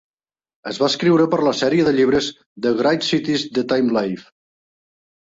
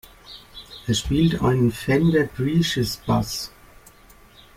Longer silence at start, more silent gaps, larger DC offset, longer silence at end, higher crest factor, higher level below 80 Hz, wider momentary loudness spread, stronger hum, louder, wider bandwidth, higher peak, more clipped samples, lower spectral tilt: first, 0.65 s vs 0.3 s; first, 2.46-2.56 s vs none; neither; about the same, 1 s vs 1.1 s; about the same, 16 dB vs 16 dB; second, -56 dBFS vs -42 dBFS; second, 11 LU vs 20 LU; neither; first, -18 LUFS vs -21 LUFS; second, 8 kHz vs 16.5 kHz; first, -4 dBFS vs -8 dBFS; neither; about the same, -5 dB/octave vs -5.5 dB/octave